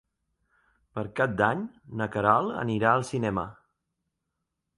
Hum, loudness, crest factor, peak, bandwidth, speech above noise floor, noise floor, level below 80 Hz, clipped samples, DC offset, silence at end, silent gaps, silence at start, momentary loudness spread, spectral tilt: none; -27 LUFS; 24 dB; -6 dBFS; 11.5 kHz; 56 dB; -83 dBFS; -58 dBFS; under 0.1%; under 0.1%; 1.25 s; none; 0.95 s; 13 LU; -6.5 dB/octave